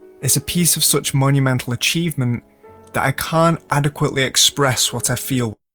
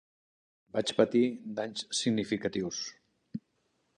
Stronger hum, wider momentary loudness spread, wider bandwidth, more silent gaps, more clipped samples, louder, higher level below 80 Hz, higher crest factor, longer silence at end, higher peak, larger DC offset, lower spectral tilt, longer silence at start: neither; second, 8 LU vs 18 LU; first, over 20 kHz vs 10.5 kHz; neither; neither; first, -17 LUFS vs -31 LUFS; first, -48 dBFS vs -70 dBFS; about the same, 18 dB vs 22 dB; second, 0.2 s vs 0.6 s; first, 0 dBFS vs -10 dBFS; neither; about the same, -3.5 dB/octave vs -4 dB/octave; second, 0.2 s vs 0.75 s